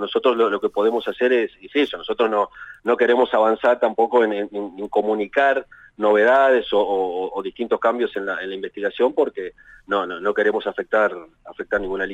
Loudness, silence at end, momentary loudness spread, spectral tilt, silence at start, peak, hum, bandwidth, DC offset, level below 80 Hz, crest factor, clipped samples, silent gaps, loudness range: -20 LUFS; 0 s; 10 LU; -5.5 dB/octave; 0 s; -6 dBFS; none; 8 kHz; under 0.1%; -56 dBFS; 14 dB; under 0.1%; none; 4 LU